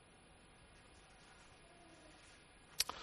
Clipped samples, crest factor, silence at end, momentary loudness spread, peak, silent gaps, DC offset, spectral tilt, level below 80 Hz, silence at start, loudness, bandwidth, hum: under 0.1%; 36 dB; 0 s; 17 LU; -16 dBFS; none; under 0.1%; 0 dB/octave; -70 dBFS; 0 s; -48 LUFS; 11.5 kHz; none